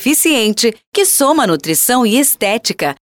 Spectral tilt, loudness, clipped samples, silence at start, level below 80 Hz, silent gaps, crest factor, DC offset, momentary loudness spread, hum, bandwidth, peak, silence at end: -2.5 dB/octave; -12 LUFS; under 0.1%; 0 s; -56 dBFS; 0.87-0.92 s; 10 dB; under 0.1%; 5 LU; none; 19 kHz; -2 dBFS; 0.15 s